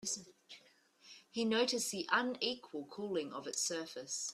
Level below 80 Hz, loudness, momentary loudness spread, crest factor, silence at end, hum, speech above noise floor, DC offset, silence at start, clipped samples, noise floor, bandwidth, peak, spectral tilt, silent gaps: -84 dBFS; -37 LUFS; 23 LU; 24 dB; 0 s; none; 29 dB; under 0.1%; 0 s; under 0.1%; -67 dBFS; 15 kHz; -14 dBFS; -1.5 dB/octave; none